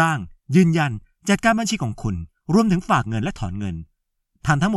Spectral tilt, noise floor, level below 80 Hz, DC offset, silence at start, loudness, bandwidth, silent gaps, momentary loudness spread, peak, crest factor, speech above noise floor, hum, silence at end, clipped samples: -6 dB/octave; -70 dBFS; -42 dBFS; under 0.1%; 0 s; -21 LUFS; 13 kHz; none; 12 LU; -2 dBFS; 18 dB; 51 dB; none; 0 s; under 0.1%